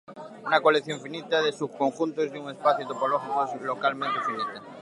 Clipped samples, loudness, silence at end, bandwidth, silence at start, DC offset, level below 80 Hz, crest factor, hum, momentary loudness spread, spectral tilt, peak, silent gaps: under 0.1%; -27 LUFS; 0 s; 11 kHz; 0.1 s; under 0.1%; -80 dBFS; 20 dB; none; 11 LU; -4.5 dB/octave; -6 dBFS; none